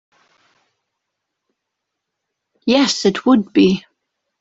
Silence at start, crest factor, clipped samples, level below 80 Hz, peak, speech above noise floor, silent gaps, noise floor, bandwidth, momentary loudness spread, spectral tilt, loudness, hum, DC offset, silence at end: 2.65 s; 18 dB; under 0.1%; -58 dBFS; -2 dBFS; 64 dB; none; -79 dBFS; 8 kHz; 8 LU; -5 dB/octave; -16 LUFS; none; under 0.1%; 0.6 s